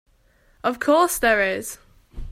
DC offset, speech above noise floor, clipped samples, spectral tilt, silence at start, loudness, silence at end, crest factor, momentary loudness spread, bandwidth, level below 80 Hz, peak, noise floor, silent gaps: under 0.1%; 39 dB; under 0.1%; -3 dB/octave; 0.65 s; -20 LUFS; 0 s; 16 dB; 15 LU; 16 kHz; -42 dBFS; -6 dBFS; -59 dBFS; none